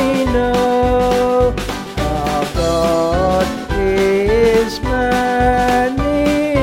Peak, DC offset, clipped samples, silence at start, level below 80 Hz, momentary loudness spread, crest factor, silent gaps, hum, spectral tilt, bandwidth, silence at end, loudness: -2 dBFS; under 0.1%; under 0.1%; 0 s; -26 dBFS; 5 LU; 14 dB; none; none; -5.5 dB/octave; 16.5 kHz; 0 s; -15 LUFS